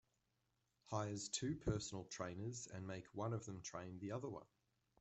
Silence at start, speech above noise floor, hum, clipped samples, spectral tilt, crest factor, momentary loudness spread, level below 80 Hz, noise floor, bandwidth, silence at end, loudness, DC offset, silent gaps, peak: 0.85 s; 39 dB; none; under 0.1%; -5 dB/octave; 20 dB; 7 LU; -66 dBFS; -86 dBFS; 8.2 kHz; 0.55 s; -47 LUFS; under 0.1%; none; -28 dBFS